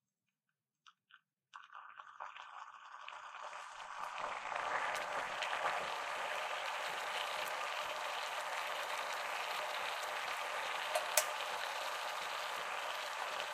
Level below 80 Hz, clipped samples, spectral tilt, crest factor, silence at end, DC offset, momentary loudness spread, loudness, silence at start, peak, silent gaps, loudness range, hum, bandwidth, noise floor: -84 dBFS; under 0.1%; 1 dB/octave; 32 dB; 0 s; under 0.1%; 13 LU; -40 LUFS; 0.85 s; -10 dBFS; none; 12 LU; none; 15.5 kHz; under -90 dBFS